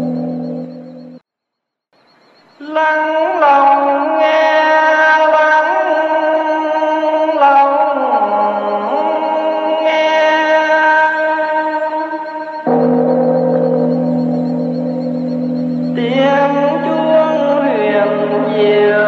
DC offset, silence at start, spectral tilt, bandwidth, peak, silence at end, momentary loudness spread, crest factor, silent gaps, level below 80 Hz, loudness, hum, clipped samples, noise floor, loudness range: under 0.1%; 0 s; -6.5 dB/octave; 6.6 kHz; 0 dBFS; 0 s; 9 LU; 14 dB; none; -68 dBFS; -13 LUFS; none; under 0.1%; -78 dBFS; 4 LU